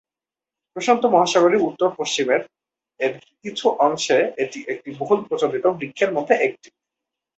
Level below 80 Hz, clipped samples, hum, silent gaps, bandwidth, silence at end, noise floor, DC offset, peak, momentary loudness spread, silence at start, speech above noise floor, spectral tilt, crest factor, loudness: -68 dBFS; under 0.1%; none; none; 8.2 kHz; 0.85 s; -90 dBFS; under 0.1%; -2 dBFS; 11 LU; 0.75 s; 70 dB; -3.5 dB/octave; 18 dB; -20 LUFS